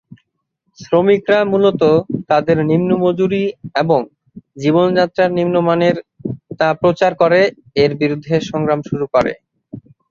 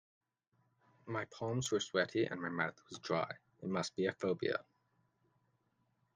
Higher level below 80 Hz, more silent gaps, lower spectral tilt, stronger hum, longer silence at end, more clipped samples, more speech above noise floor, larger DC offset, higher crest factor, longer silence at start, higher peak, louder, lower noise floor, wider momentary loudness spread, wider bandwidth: first, -52 dBFS vs -76 dBFS; neither; first, -7 dB/octave vs -4.5 dB/octave; neither; second, 0.3 s vs 1.55 s; neither; first, 55 dB vs 41 dB; neither; second, 14 dB vs 22 dB; second, 0.8 s vs 1.05 s; first, 0 dBFS vs -18 dBFS; first, -15 LUFS vs -38 LUFS; second, -69 dBFS vs -79 dBFS; about the same, 7 LU vs 8 LU; second, 7.2 kHz vs 9.6 kHz